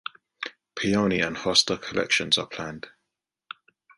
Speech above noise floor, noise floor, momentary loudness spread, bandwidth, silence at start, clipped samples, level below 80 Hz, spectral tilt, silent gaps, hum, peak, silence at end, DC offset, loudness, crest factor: 58 dB; -83 dBFS; 23 LU; 11.5 kHz; 0.4 s; under 0.1%; -58 dBFS; -3 dB/octave; none; none; -6 dBFS; 1.1 s; under 0.1%; -24 LUFS; 22 dB